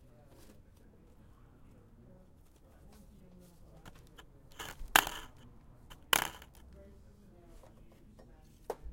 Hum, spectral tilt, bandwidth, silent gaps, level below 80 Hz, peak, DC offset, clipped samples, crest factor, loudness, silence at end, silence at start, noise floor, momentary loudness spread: none; -1 dB/octave; 16.5 kHz; none; -56 dBFS; -4 dBFS; under 0.1%; under 0.1%; 38 dB; -33 LUFS; 0 s; 0.45 s; -60 dBFS; 31 LU